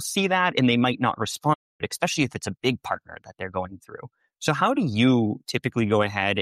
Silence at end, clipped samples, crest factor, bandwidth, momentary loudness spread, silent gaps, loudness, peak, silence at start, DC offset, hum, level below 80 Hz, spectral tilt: 0 s; under 0.1%; 16 dB; 15.5 kHz; 13 LU; 1.55-1.79 s; -24 LUFS; -8 dBFS; 0 s; under 0.1%; none; -60 dBFS; -5 dB/octave